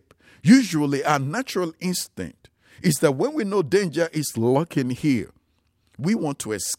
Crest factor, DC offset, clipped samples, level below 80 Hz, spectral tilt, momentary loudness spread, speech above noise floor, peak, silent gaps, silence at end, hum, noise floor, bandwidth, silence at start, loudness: 20 dB; under 0.1%; under 0.1%; -62 dBFS; -5 dB/octave; 11 LU; 45 dB; -4 dBFS; none; 0.05 s; none; -67 dBFS; 16.5 kHz; 0.45 s; -22 LUFS